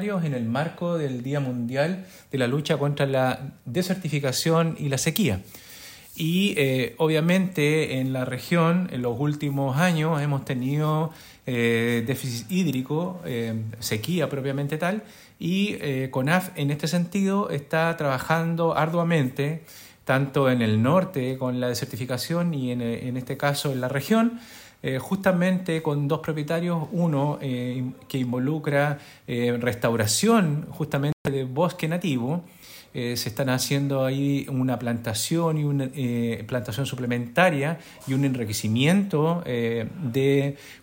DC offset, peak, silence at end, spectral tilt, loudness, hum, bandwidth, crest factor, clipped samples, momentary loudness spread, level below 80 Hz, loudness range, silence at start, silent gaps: under 0.1%; -4 dBFS; 0.05 s; -5.5 dB/octave; -25 LUFS; none; 16.5 kHz; 20 dB; under 0.1%; 8 LU; -60 dBFS; 3 LU; 0 s; 31.13-31.25 s